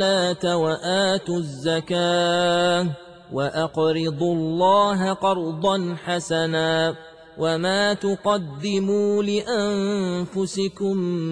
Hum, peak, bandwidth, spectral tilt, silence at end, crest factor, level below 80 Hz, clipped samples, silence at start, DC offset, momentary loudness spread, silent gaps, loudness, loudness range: none; -8 dBFS; 10.5 kHz; -5 dB/octave; 0 s; 14 dB; -60 dBFS; under 0.1%; 0 s; 0.1%; 6 LU; none; -22 LUFS; 2 LU